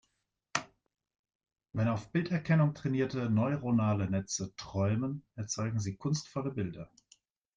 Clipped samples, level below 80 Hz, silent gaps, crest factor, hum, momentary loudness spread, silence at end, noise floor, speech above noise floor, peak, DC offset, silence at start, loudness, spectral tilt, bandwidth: under 0.1%; -64 dBFS; 1.19-1.24 s, 1.35-1.39 s; 20 dB; none; 9 LU; 0.7 s; -81 dBFS; 50 dB; -12 dBFS; under 0.1%; 0.55 s; -33 LUFS; -6 dB/octave; 9.6 kHz